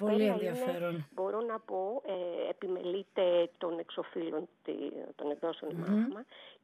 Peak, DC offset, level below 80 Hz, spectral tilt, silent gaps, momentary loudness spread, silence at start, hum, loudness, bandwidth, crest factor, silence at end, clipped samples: -18 dBFS; under 0.1%; under -90 dBFS; -7 dB/octave; none; 10 LU; 0 s; none; -35 LUFS; 13.5 kHz; 16 dB; 0.1 s; under 0.1%